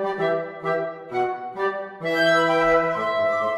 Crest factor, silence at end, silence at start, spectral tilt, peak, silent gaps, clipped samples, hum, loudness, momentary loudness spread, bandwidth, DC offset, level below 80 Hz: 16 dB; 0 s; 0 s; -5 dB/octave; -8 dBFS; none; under 0.1%; none; -22 LUFS; 9 LU; 14 kHz; under 0.1%; -56 dBFS